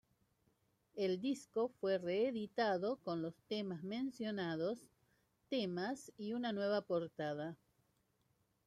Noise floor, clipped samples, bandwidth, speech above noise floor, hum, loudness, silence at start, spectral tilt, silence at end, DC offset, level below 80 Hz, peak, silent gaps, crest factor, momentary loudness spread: -80 dBFS; under 0.1%; 13.5 kHz; 40 dB; none; -41 LUFS; 0.95 s; -6 dB/octave; 1.1 s; under 0.1%; -82 dBFS; -24 dBFS; none; 18 dB; 7 LU